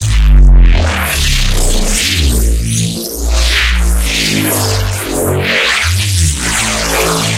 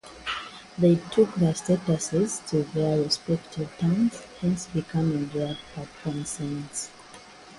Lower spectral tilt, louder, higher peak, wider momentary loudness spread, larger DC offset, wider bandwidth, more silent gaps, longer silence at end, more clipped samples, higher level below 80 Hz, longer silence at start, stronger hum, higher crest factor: second, -3.5 dB/octave vs -5.5 dB/octave; first, -12 LUFS vs -27 LUFS; first, 0 dBFS vs -8 dBFS; second, 5 LU vs 13 LU; neither; first, 16 kHz vs 11.5 kHz; neither; about the same, 0 s vs 0 s; neither; first, -12 dBFS vs -56 dBFS; about the same, 0 s vs 0.05 s; neither; second, 10 dB vs 18 dB